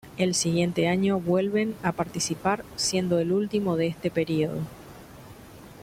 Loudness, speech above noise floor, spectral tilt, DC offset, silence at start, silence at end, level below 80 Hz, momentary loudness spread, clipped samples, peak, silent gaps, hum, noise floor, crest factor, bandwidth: -26 LUFS; 21 dB; -5 dB/octave; under 0.1%; 0.05 s; 0 s; -56 dBFS; 22 LU; under 0.1%; -8 dBFS; none; none; -46 dBFS; 18 dB; 16 kHz